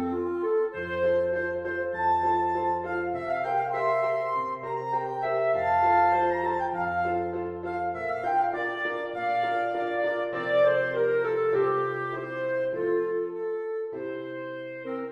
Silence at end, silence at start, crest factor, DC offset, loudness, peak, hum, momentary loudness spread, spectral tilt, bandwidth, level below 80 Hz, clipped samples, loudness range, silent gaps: 0 s; 0 s; 16 dB; under 0.1%; -27 LUFS; -12 dBFS; none; 9 LU; -7 dB/octave; 8.2 kHz; -60 dBFS; under 0.1%; 3 LU; none